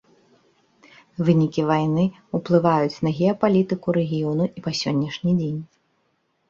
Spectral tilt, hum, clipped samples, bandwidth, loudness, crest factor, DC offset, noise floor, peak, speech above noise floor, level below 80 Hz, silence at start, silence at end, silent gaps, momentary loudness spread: -7.5 dB/octave; none; under 0.1%; 7.4 kHz; -22 LUFS; 18 dB; under 0.1%; -69 dBFS; -4 dBFS; 48 dB; -58 dBFS; 1.2 s; 0.85 s; none; 6 LU